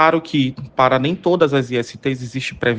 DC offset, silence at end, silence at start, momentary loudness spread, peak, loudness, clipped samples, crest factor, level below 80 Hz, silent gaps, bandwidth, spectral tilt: under 0.1%; 0 s; 0 s; 8 LU; 0 dBFS; -18 LUFS; under 0.1%; 16 dB; -52 dBFS; none; 9.4 kHz; -6 dB/octave